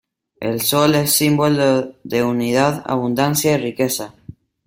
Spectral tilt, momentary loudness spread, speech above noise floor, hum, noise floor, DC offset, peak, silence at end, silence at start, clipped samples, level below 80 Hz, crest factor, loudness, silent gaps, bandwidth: -4.5 dB/octave; 9 LU; 24 dB; none; -41 dBFS; under 0.1%; -2 dBFS; 0.55 s; 0.4 s; under 0.1%; -54 dBFS; 16 dB; -17 LUFS; none; 16.5 kHz